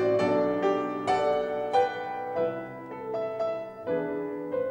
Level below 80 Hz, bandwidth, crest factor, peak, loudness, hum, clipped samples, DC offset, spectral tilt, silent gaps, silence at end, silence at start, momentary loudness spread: -64 dBFS; 16 kHz; 16 dB; -12 dBFS; -29 LUFS; none; under 0.1%; under 0.1%; -6.5 dB/octave; none; 0 s; 0 s; 9 LU